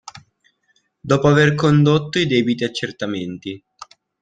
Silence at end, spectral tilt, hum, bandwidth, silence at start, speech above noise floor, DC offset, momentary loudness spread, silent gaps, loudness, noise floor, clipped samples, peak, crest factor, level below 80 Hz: 0.65 s; -6.5 dB/octave; none; 9.2 kHz; 0.05 s; 48 dB; under 0.1%; 18 LU; none; -17 LUFS; -65 dBFS; under 0.1%; -2 dBFS; 18 dB; -54 dBFS